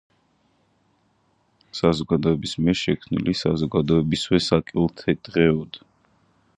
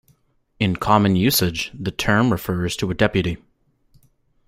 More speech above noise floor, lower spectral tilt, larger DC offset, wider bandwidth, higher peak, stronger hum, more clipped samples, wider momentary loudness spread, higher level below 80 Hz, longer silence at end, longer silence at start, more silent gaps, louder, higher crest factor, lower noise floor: about the same, 44 dB vs 42 dB; first, -6.5 dB/octave vs -5 dB/octave; neither; second, 10.5 kHz vs 16 kHz; about the same, -4 dBFS vs -2 dBFS; neither; neither; second, 6 LU vs 9 LU; about the same, -46 dBFS vs -44 dBFS; second, 0.8 s vs 1.1 s; first, 1.75 s vs 0.6 s; neither; about the same, -22 LUFS vs -20 LUFS; about the same, 20 dB vs 20 dB; first, -65 dBFS vs -61 dBFS